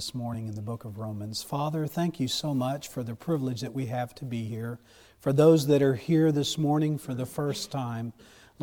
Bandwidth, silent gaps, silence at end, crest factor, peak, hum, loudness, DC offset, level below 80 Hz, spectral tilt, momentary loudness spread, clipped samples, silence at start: 18 kHz; none; 0 s; 20 dB; -8 dBFS; none; -28 LUFS; under 0.1%; -62 dBFS; -6 dB/octave; 15 LU; under 0.1%; 0 s